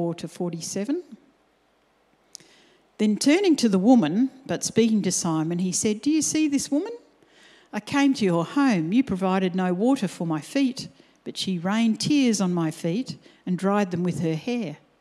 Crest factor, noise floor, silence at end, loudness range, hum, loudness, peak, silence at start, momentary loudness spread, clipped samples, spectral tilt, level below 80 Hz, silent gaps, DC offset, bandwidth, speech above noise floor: 18 dB; -64 dBFS; 0.25 s; 3 LU; none; -23 LUFS; -6 dBFS; 0 s; 11 LU; under 0.1%; -5 dB/octave; -64 dBFS; none; under 0.1%; 13.5 kHz; 41 dB